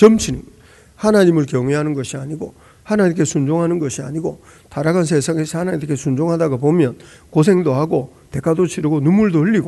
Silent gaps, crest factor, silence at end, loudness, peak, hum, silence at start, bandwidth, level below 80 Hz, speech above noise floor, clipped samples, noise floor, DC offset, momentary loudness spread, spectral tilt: none; 16 dB; 0 s; -17 LUFS; 0 dBFS; none; 0 s; 12 kHz; -46 dBFS; 28 dB; 0.1%; -45 dBFS; under 0.1%; 11 LU; -6.5 dB/octave